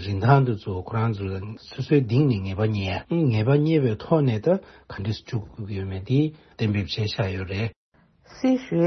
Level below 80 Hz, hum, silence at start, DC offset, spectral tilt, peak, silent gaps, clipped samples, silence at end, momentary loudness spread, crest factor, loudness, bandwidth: -54 dBFS; none; 0 s; under 0.1%; -8.5 dB/octave; -4 dBFS; 7.76-7.92 s; under 0.1%; 0 s; 12 LU; 20 dB; -24 LUFS; 6.4 kHz